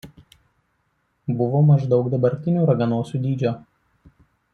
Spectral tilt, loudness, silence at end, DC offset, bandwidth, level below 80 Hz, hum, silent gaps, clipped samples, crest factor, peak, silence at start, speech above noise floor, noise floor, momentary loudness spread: -10 dB/octave; -20 LUFS; 0.95 s; under 0.1%; 6.4 kHz; -58 dBFS; none; none; under 0.1%; 16 dB; -6 dBFS; 0.05 s; 50 dB; -69 dBFS; 10 LU